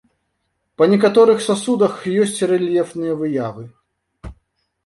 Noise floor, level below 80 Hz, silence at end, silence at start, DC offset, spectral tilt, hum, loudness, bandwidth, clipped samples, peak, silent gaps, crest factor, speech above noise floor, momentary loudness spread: -71 dBFS; -50 dBFS; 0.55 s; 0.8 s; under 0.1%; -5.5 dB/octave; none; -17 LUFS; 11.5 kHz; under 0.1%; -2 dBFS; none; 16 dB; 55 dB; 10 LU